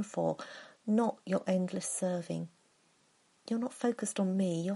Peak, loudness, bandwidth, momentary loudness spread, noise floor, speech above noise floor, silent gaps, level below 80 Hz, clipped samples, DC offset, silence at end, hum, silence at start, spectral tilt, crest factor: -18 dBFS; -34 LUFS; 11.5 kHz; 12 LU; -70 dBFS; 37 dB; none; -82 dBFS; under 0.1%; under 0.1%; 0 s; none; 0 s; -6 dB/octave; 16 dB